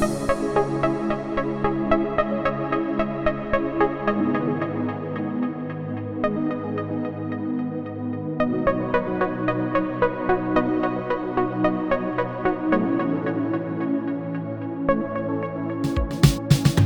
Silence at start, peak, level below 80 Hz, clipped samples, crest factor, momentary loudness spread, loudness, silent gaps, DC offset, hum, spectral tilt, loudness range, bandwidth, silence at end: 0 s; -2 dBFS; -40 dBFS; under 0.1%; 20 dB; 7 LU; -24 LUFS; none; under 0.1%; none; -7 dB/octave; 3 LU; over 20 kHz; 0 s